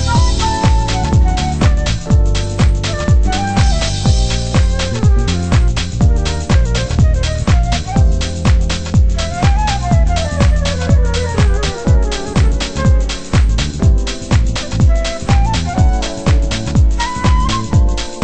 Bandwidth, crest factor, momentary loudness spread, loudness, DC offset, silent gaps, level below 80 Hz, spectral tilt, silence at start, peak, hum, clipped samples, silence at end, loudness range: 8.8 kHz; 12 dB; 2 LU; -15 LUFS; under 0.1%; none; -14 dBFS; -5.5 dB/octave; 0 s; 0 dBFS; none; under 0.1%; 0 s; 1 LU